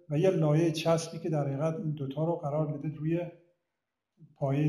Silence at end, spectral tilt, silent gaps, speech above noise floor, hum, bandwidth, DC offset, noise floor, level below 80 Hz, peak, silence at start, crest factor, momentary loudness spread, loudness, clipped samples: 0 s; -7 dB/octave; none; 57 dB; none; 13 kHz; under 0.1%; -87 dBFS; -68 dBFS; -14 dBFS; 0.1 s; 18 dB; 8 LU; -30 LUFS; under 0.1%